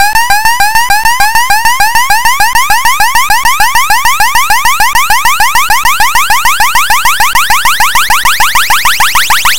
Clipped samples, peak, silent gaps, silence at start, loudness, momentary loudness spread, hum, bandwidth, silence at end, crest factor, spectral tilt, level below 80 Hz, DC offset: 0.3%; 0 dBFS; none; 0 s; -6 LUFS; 1 LU; none; over 20 kHz; 0 s; 10 dB; 1 dB/octave; -26 dBFS; 20%